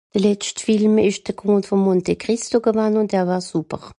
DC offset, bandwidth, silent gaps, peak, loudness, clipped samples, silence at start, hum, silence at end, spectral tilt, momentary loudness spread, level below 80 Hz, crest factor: under 0.1%; 11 kHz; none; -4 dBFS; -19 LUFS; under 0.1%; 0.15 s; none; 0.05 s; -5.5 dB/octave; 7 LU; -54 dBFS; 14 dB